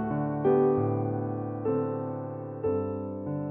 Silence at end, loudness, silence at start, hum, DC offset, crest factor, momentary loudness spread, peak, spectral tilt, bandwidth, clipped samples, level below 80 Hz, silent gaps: 0 s; -29 LUFS; 0 s; none; under 0.1%; 16 dB; 11 LU; -12 dBFS; -10.5 dB/octave; 3.4 kHz; under 0.1%; -60 dBFS; none